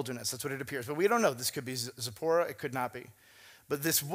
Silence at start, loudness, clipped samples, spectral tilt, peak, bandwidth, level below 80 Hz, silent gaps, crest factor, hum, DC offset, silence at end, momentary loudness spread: 0 s; -32 LUFS; under 0.1%; -3.5 dB/octave; -12 dBFS; 16 kHz; -74 dBFS; none; 20 dB; none; under 0.1%; 0 s; 9 LU